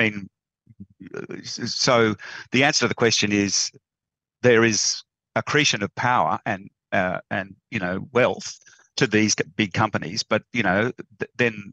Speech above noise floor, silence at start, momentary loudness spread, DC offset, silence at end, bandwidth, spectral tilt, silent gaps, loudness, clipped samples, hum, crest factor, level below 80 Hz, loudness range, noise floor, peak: 66 dB; 0 s; 14 LU; under 0.1%; 0.05 s; 8.8 kHz; -3.5 dB/octave; none; -22 LUFS; under 0.1%; none; 20 dB; -64 dBFS; 4 LU; -88 dBFS; -4 dBFS